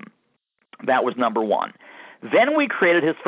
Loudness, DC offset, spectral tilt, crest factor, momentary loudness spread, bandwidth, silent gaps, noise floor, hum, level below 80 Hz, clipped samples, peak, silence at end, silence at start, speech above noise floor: -20 LUFS; under 0.1%; -8.5 dB/octave; 16 dB; 12 LU; 4 kHz; none; -70 dBFS; none; -76 dBFS; under 0.1%; -6 dBFS; 0 s; 0.8 s; 51 dB